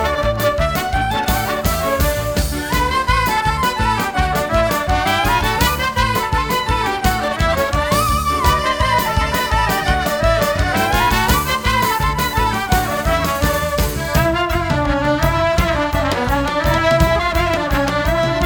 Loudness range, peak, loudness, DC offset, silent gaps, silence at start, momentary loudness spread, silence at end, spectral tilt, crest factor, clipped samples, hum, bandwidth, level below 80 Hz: 1 LU; 0 dBFS; -17 LUFS; 0.2%; none; 0 s; 3 LU; 0 s; -4.5 dB/octave; 16 dB; under 0.1%; none; over 20 kHz; -24 dBFS